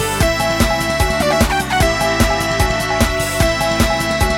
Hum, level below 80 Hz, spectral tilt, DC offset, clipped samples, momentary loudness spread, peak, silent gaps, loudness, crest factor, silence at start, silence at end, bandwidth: none; -24 dBFS; -4 dB/octave; under 0.1%; under 0.1%; 2 LU; 0 dBFS; none; -15 LUFS; 16 dB; 0 s; 0 s; 17.5 kHz